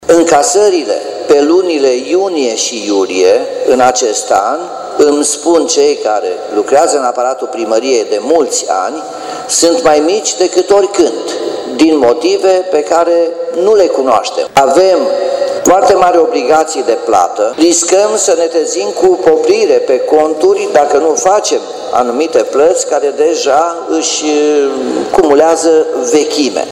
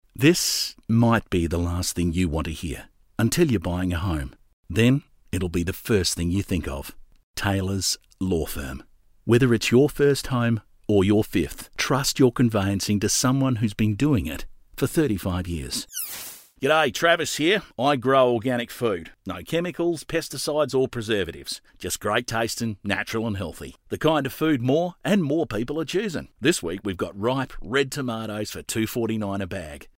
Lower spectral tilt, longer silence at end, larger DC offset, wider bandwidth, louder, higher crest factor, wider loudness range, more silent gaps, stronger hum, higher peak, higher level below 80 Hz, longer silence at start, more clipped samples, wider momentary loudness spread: second, -2.5 dB/octave vs -5 dB/octave; second, 0 s vs 0.15 s; neither; about the same, 15.5 kHz vs 16 kHz; first, -10 LUFS vs -24 LUFS; second, 10 dB vs 18 dB; about the same, 2 LU vs 4 LU; second, none vs 4.53-4.63 s, 7.23-7.34 s; neither; first, 0 dBFS vs -6 dBFS; second, -50 dBFS vs -44 dBFS; second, 0 s vs 0.15 s; first, 0.4% vs under 0.1%; second, 7 LU vs 12 LU